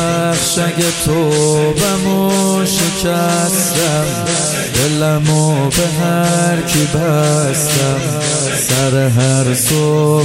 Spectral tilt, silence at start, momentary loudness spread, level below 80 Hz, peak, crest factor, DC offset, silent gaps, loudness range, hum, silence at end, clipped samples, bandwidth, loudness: -4.5 dB/octave; 0 s; 2 LU; -38 dBFS; -2 dBFS; 12 dB; under 0.1%; none; 1 LU; none; 0 s; under 0.1%; 16.5 kHz; -13 LUFS